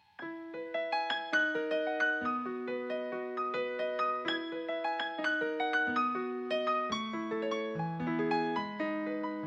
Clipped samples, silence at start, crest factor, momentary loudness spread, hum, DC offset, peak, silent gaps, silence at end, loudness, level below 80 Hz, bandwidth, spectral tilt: under 0.1%; 0.2 s; 16 dB; 7 LU; none; under 0.1%; -18 dBFS; none; 0 s; -34 LUFS; -76 dBFS; 8.4 kHz; -5 dB/octave